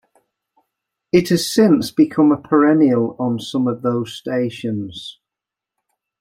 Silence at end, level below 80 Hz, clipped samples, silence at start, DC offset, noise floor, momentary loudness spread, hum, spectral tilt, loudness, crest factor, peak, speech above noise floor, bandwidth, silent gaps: 1.1 s; -58 dBFS; under 0.1%; 1.15 s; under 0.1%; -86 dBFS; 11 LU; none; -6 dB/octave; -17 LUFS; 16 dB; -2 dBFS; 69 dB; 15.5 kHz; none